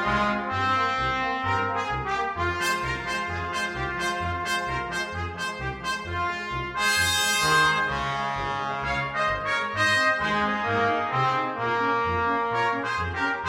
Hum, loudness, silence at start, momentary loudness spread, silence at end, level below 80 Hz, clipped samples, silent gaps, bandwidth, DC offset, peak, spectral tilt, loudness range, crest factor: none; -25 LUFS; 0 s; 8 LU; 0 s; -46 dBFS; under 0.1%; none; 16 kHz; under 0.1%; -10 dBFS; -3 dB/octave; 5 LU; 16 dB